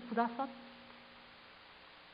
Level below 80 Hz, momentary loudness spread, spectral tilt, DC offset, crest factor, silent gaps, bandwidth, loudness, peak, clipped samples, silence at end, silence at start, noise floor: -78 dBFS; 20 LU; -3 dB/octave; under 0.1%; 24 dB; none; 5 kHz; -39 LUFS; -18 dBFS; under 0.1%; 0 s; 0 s; -58 dBFS